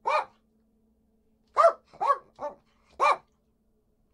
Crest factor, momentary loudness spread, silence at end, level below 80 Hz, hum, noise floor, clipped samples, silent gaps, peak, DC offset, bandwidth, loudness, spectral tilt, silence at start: 22 dB; 17 LU; 0.95 s; -72 dBFS; none; -70 dBFS; under 0.1%; none; -8 dBFS; under 0.1%; 11.5 kHz; -26 LUFS; -2 dB/octave; 0.05 s